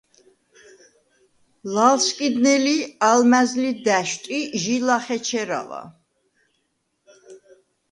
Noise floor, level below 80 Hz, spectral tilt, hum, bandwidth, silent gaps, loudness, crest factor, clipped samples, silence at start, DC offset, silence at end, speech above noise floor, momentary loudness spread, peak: -72 dBFS; -72 dBFS; -3 dB/octave; none; 11 kHz; none; -20 LUFS; 20 dB; under 0.1%; 1.65 s; under 0.1%; 0.55 s; 52 dB; 11 LU; -2 dBFS